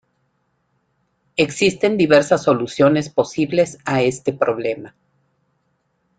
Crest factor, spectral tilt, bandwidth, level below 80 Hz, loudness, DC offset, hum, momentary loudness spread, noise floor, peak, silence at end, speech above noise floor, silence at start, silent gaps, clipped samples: 18 dB; -5.5 dB/octave; 9.4 kHz; -58 dBFS; -18 LUFS; under 0.1%; none; 8 LU; -68 dBFS; -2 dBFS; 1.3 s; 50 dB; 1.4 s; none; under 0.1%